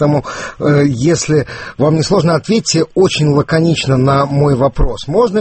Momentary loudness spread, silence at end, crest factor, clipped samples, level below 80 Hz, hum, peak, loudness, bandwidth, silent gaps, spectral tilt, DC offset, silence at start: 4 LU; 0 s; 12 dB; under 0.1%; -28 dBFS; none; 0 dBFS; -13 LUFS; 8.6 kHz; none; -6 dB/octave; under 0.1%; 0 s